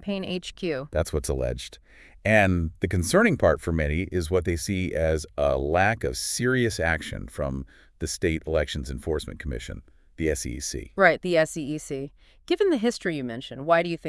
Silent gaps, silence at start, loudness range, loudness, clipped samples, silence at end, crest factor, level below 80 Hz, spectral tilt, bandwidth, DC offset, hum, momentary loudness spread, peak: none; 0.05 s; 6 LU; -26 LUFS; under 0.1%; 0 s; 22 dB; -40 dBFS; -5 dB/octave; 12 kHz; under 0.1%; none; 13 LU; -4 dBFS